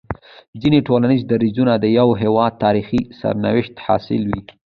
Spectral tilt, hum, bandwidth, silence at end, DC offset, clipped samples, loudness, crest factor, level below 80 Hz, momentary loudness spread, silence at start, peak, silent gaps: -9.5 dB/octave; none; 5.4 kHz; 0.3 s; under 0.1%; under 0.1%; -17 LUFS; 16 dB; -44 dBFS; 8 LU; 0.1 s; -2 dBFS; 0.48-0.53 s